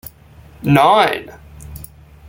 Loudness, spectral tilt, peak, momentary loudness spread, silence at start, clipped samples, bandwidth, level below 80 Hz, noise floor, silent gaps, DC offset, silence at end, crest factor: -14 LUFS; -6 dB/octave; 0 dBFS; 24 LU; 0.05 s; under 0.1%; 17 kHz; -44 dBFS; -43 dBFS; none; under 0.1%; 0.45 s; 18 dB